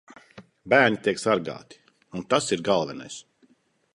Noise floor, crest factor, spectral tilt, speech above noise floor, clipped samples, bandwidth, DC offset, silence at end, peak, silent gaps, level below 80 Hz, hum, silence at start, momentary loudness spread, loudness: -63 dBFS; 22 dB; -4 dB/octave; 39 dB; under 0.1%; 11.5 kHz; under 0.1%; 0.75 s; -4 dBFS; none; -64 dBFS; none; 0.35 s; 20 LU; -23 LUFS